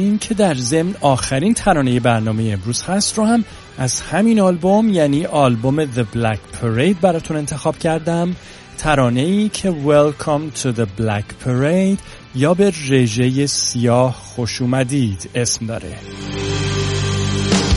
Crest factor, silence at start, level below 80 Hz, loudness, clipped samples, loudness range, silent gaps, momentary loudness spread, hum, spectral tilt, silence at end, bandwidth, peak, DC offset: 16 dB; 0 s; -40 dBFS; -17 LUFS; under 0.1%; 3 LU; none; 8 LU; none; -5 dB/octave; 0 s; 11.5 kHz; 0 dBFS; under 0.1%